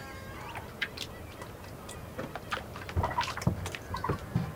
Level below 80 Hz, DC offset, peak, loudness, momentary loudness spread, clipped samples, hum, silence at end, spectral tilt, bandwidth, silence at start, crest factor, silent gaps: -50 dBFS; under 0.1%; -14 dBFS; -36 LUFS; 12 LU; under 0.1%; none; 0 s; -5 dB/octave; 18 kHz; 0 s; 24 dB; none